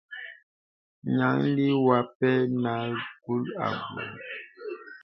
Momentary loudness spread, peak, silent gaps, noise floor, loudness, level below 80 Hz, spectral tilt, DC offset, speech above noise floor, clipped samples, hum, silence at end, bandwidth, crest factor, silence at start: 16 LU; -8 dBFS; 0.43-1.02 s, 2.15-2.20 s; under -90 dBFS; -27 LUFS; -70 dBFS; -9.5 dB/octave; under 0.1%; over 64 dB; under 0.1%; none; 0.05 s; 5.8 kHz; 20 dB; 0.1 s